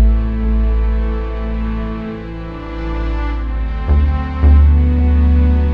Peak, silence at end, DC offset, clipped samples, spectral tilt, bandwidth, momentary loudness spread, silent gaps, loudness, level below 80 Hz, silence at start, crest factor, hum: 0 dBFS; 0 s; under 0.1%; under 0.1%; -10 dB/octave; 4.5 kHz; 13 LU; none; -16 LUFS; -14 dBFS; 0 s; 14 dB; none